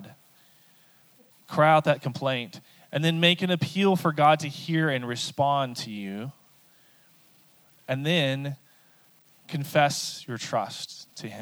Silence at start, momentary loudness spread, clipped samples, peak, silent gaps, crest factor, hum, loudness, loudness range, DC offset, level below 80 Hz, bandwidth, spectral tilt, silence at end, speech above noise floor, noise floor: 0 s; 16 LU; under 0.1%; -6 dBFS; none; 20 dB; none; -25 LUFS; 8 LU; under 0.1%; -76 dBFS; over 20 kHz; -5 dB/octave; 0 s; 34 dB; -59 dBFS